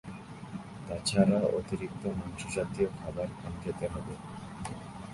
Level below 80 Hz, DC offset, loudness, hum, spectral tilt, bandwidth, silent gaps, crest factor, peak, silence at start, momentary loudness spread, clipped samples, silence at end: -52 dBFS; under 0.1%; -34 LUFS; none; -6 dB/octave; 11.5 kHz; none; 22 dB; -12 dBFS; 0.05 s; 17 LU; under 0.1%; 0 s